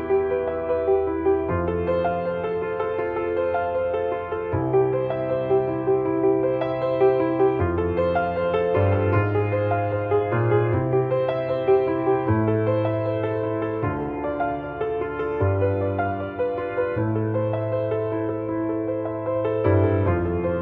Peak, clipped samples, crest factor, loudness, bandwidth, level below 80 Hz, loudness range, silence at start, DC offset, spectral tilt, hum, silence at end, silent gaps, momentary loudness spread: -6 dBFS; under 0.1%; 16 dB; -23 LUFS; 4.5 kHz; -48 dBFS; 3 LU; 0 s; under 0.1%; -11 dB/octave; none; 0 s; none; 6 LU